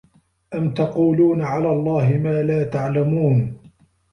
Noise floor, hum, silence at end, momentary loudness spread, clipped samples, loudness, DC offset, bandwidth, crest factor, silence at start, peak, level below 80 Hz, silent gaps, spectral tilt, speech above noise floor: -52 dBFS; none; 0.55 s; 7 LU; under 0.1%; -19 LUFS; under 0.1%; 6.4 kHz; 12 dB; 0.5 s; -6 dBFS; -52 dBFS; none; -10 dB/octave; 34 dB